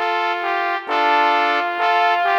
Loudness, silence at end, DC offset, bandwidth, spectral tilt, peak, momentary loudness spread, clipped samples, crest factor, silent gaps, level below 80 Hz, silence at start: -18 LUFS; 0 s; under 0.1%; 19 kHz; -1 dB/octave; -2 dBFS; 5 LU; under 0.1%; 16 dB; none; -74 dBFS; 0 s